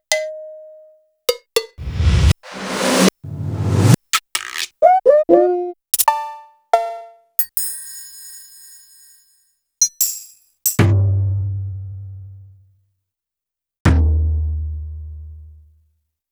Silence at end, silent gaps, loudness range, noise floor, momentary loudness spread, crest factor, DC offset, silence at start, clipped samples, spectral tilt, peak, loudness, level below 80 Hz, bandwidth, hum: 0.8 s; 13.80-13.85 s; 7 LU; -86 dBFS; 21 LU; 20 dB; under 0.1%; 0.1 s; under 0.1%; -4.5 dB/octave; 0 dBFS; -18 LUFS; -28 dBFS; over 20 kHz; none